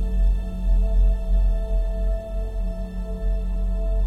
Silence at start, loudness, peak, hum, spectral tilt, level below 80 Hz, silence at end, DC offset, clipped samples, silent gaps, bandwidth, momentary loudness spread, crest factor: 0 s; -26 LUFS; -10 dBFS; none; -8.5 dB/octave; -20 dBFS; 0 s; under 0.1%; under 0.1%; none; 3.8 kHz; 8 LU; 10 dB